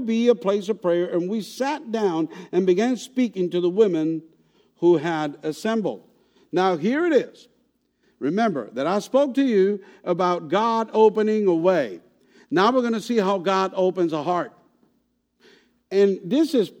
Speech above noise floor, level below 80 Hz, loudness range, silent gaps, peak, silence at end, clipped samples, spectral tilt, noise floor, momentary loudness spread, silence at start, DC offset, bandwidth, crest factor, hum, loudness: 48 dB; -76 dBFS; 4 LU; none; -4 dBFS; 0.1 s; under 0.1%; -6 dB/octave; -69 dBFS; 8 LU; 0 s; under 0.1%; 16 kHz; 18 dB; none; -22 LUFS